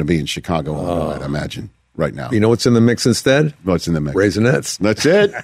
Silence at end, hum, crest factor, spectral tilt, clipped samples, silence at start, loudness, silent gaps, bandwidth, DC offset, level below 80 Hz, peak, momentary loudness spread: 0 s; none; 14 dB; -5.5 dB/octave; under 0.1%; 0 s; -17 LUFS; none; 16 kHz; under 0.1%; -40 dBFS; -2 dBFS; 10 LU